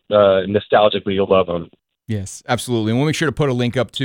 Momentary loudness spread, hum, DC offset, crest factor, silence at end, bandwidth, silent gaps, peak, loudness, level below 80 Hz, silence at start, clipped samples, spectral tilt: 12 LU; none; under 0.1%; 14 dB; 0 s; 17 kHz; none; -2 dBFS; -18 LUFS; -50 dBFS; 0.1 s; under 0.1%; -5.5 dB/octave